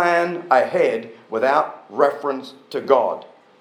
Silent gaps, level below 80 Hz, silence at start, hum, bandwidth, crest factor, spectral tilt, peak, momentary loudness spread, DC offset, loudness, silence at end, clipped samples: none; -86 dBFS; 0 s; none; 13 kHz; 20 dB; -5.5 dB/octave; 0 dBFS; 12 LU; under 0.1%; -20 LUFS; 0.4 s; under 0.1%